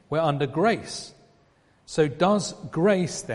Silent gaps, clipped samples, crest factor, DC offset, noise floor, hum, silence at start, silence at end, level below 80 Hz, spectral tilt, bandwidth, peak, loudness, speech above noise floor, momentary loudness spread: none; under 0.1%; 18 dB; under 0.1%; -61 dBFS; none; 0.1 s; 0 s; -58 dBFS; -5.5 dB/octave; 11.5 kHz; -6 dBFS; -24 LUFS; 37 dB; 12 LU